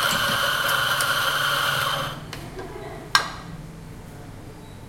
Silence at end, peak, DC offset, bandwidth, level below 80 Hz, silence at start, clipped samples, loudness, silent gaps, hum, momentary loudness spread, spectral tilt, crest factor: 0 s; 0 dBFS; under 0.1%; 16.5 kHz; -48 dBFS; 0 s; under 0.1%; -22 LUFS; none; none; 20 LU; -2 dB/octave; 26 dB